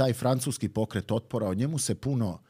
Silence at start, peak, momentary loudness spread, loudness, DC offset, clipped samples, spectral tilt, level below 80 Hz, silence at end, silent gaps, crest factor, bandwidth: 0 s; -12 dBFS; 4 LU; -29 LUFS; under 0.1%; under 0.1%; -5.5 dB/octave; -58 dBFS; 0.15 s; none; 16 dB; 16 kHz